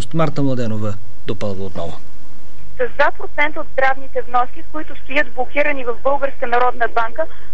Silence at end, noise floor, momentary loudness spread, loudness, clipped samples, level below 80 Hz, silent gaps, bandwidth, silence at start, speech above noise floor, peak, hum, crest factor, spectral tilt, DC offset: 0.1 s; -44 dBFS; 12 LU; -20 LUFS; under 0.1%; -44 dBFS; none; 11 kHz; 0 s; 23 dB; -2 dBFS; none; 16 dB; -6.5 dB/octave; 30%